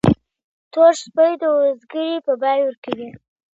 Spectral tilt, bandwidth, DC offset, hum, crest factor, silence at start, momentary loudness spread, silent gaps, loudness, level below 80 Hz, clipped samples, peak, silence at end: -6.5 dB/octave; 8.2 kHz; under 0.1%; none; 18 dB; 0.05 s; 14 LU; 0.44-0.71 s, 2.77-2.82 s; -18 LUFS; -46 dBFS; under 0.1%; -2 dBFS; 0.5 s